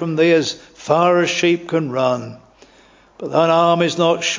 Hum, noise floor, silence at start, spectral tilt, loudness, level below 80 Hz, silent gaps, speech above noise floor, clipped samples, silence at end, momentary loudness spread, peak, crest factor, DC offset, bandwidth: none; -50 dBFS; 0 s; -4.5 dB/octave; -16 LUFS; -60 dBFS; none; 33 dB; under 0.1%; 0 s; 11 LU; 0 dBFS; 16 dB; under 0.1%; 7.6 kHz